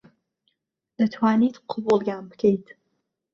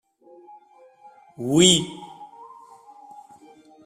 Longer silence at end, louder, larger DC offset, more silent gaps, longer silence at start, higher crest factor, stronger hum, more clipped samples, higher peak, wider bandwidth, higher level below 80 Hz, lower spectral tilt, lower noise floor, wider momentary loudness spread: second, 0.7 s vs 1.6 s; second, -23 LUFS vs -18 LUFS; neither; neither; second, 1 s vs 1.4 s; second, 18 dB vs 24 dB; neither; neither; second, -8 dBFS vs -2 dBFS; second, 7 kHz vs 15 kHz; second, -66 dBFS vs -60 dBFS; first, -7.5 dB/octave vs -3.5 dB/octave; first, -78 dBFS vs -52 dBFS; second, 9 LU vs 28 LU